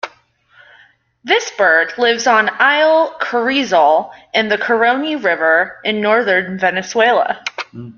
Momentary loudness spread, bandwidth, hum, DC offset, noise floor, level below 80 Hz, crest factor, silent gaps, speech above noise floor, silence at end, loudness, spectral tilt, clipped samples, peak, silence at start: 7 LU; 7.2 kHz; none; under 0.1%; -52 dBFS; -62 dBFS; 14 dB; none; 37 dB; 0.05 s; -14 LUFS; -3 dB/octave; under 0.1%; -2 dBFS; 0.05 s